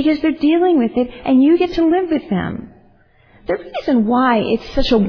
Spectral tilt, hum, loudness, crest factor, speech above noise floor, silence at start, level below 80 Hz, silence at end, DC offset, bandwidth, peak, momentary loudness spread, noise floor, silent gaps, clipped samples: -7.5 dB/octave; none; -16 LUFS; 12 dB; 36 dB; 0 s; -34 dBFS; 0 s; under 0.1%; 5.4 kHz; -2 dBFS; 10 LU; -51 dBFS; none; under 0.1%